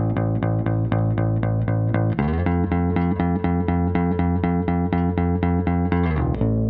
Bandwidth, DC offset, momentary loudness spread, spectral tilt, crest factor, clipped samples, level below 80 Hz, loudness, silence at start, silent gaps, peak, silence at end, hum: 4.2 kHz; under 0.1%; 1 LU; -9 dB/octave; 14 dB; under 0.1%; -34 dBFS; -22 LUFS; 0 s; none; -6 dBFS; 0 s; none